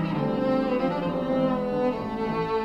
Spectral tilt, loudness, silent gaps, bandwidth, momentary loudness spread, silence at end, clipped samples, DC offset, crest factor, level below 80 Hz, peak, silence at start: -8.5 dB/octave; -26 LUFS; none; 8.2 kHz; 3 LU; 0 s; under 0.1%; under 0.1%; 12 dB; -50 dBFS; -12 dBFS; 0 s